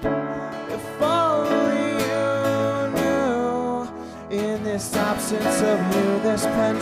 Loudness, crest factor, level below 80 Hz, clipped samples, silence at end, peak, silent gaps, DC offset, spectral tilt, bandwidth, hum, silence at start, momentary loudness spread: -22 LUFS; 14 dB; -50 dBFS; under 0.1%; 0 s; -10 dBFS; none; under 0.1%; -5 dB/octave; 15.5 kHz; none; 0 s; 9 LU